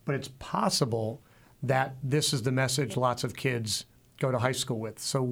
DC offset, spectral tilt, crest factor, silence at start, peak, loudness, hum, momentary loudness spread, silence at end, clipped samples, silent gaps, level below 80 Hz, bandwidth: under 0.1%; -4.5 dB/octave; 18 dB; 0.05 s; -12 dBFS; -29 LUFS; none; 7 LU; 0 s; under 0.1%; none; -60 dBFS; 17 kHz